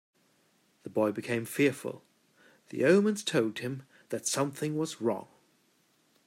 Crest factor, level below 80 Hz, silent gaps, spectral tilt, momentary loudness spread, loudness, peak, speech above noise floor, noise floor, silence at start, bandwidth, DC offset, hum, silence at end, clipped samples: 22 dB; -80 dBFS; none; -4.5 dB/octave; 16 LU; -30 LUFS; -10 dBFS; 40 dB; -69 dBFS; 0.85 s; 16 kHz; under 0.1%; none; 1.05 s; under 0.1%